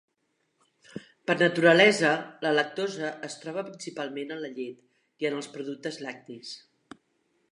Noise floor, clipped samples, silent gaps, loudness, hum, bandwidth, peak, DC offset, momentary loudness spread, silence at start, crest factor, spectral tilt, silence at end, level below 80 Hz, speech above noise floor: -76 dBFS; under 0.1%; none; -26 LUFS; none; 11.5 kHz; -6 dBFS; under 0.1%; 22 LU; 0.95 s; 22 dB; -4.5 dB/octave; 0.95 s; -80 dBFS; 48 dB